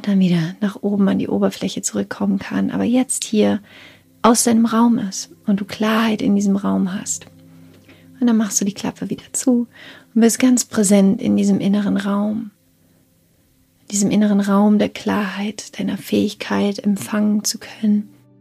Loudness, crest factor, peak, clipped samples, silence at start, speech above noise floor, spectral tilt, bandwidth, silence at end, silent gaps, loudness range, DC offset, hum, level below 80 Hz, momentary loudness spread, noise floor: -18 LUFS; 16 dB; -2 dBFS; under 0.1%; 0 s; 40 dB; -5 dB/octave; 15 kHz; 0.35 s; none; 4 LU; under 0.1%; none; -60 dBFS; 10 LU; -57 dBFS